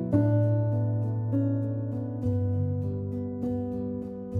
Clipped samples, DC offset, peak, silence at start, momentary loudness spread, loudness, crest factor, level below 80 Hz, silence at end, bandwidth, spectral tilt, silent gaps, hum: under 0.1%; under 0.1%; -10 dBFS; 0 s; 8 LU; -29 LUFS; 16 dB; -54 dBFS; 0 s; 2.1 kHz; -12 dB/octave; none; none